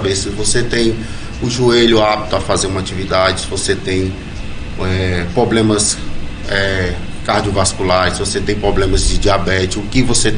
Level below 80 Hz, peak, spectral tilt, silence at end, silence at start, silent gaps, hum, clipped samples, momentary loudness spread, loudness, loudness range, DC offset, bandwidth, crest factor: -24 dBFS; 0 dBFS; -4 dB/octave; 0 s; 0 s; none; none; under 0.1%; 10 LU; -15 LUFS; 2 LU; under 0.1%; 10 kHz; 14 dB